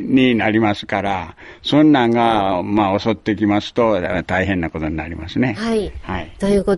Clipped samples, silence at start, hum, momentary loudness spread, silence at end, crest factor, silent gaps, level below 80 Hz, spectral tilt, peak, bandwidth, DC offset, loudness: under 0.1%; 0 s; none; 11 LU; 0 s; 14 dB; none; -40 dBFS; -6.5 dB/octave; -2 dBFS; 11.5 kHz; under 0.1%; -18 LUFS